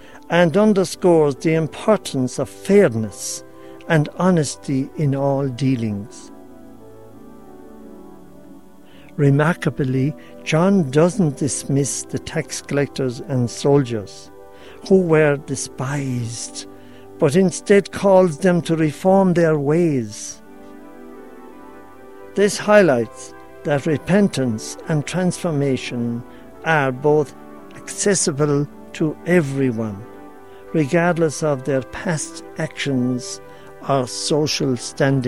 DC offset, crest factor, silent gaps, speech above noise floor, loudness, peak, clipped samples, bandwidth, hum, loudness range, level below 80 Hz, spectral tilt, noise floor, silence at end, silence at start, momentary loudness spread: 0.6%; 18 dB; none; 27 dB; -19 LUFS; -2 dBFS; under 0.1%; 14.5 kHz; none; 5 LU; -54 dBFS; -5.5 dB/octave; -45 dBFS; 0 s; 0.15 s; 15 LU